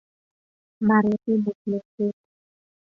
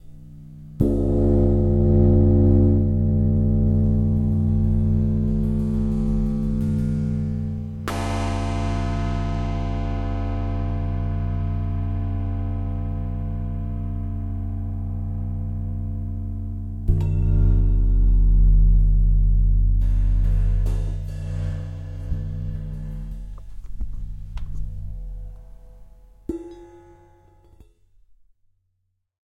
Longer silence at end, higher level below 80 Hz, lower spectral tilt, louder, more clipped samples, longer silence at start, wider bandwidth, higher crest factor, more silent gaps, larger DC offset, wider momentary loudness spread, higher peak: second, 0.85 s vs 2.5 s; second, -66 dBFS vs -24 dBFS; about the same, -10 dB/octave vs -9.5 dB/octave; about the same, -24 LUFS vs -23 LUFS; neither; first, 0.8 s vs 0.05 s; second, 2.6 kHz vs 6.6 kHz; about the same, 18 dB vs 16 dB; first, 1.55-1.65 s, 1.85-1.98 s vs none; neither; second, 9 LU vs 16 LU; second, -8 dBFS vs -4 dBFS